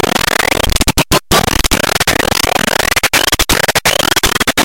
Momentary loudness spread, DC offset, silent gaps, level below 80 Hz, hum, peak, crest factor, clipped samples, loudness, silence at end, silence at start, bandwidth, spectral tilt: 2 LU; under 0.1%; none; -24 dBFS; none; 0 dBFS; 12 dB; under 0.1%; -11 LUFS; 0 s; 0 s; 17.5 kHz; -2 dB/octave